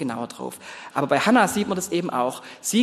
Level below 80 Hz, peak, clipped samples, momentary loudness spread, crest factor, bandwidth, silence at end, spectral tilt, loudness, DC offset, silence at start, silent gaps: -64 dBFS; -4 dBFS; under 0.1%; 16 LU; 20 dB; 13 kHz; 0 s; -4 dB/octave; -23 LUFS; under 0.1%; 0 s; none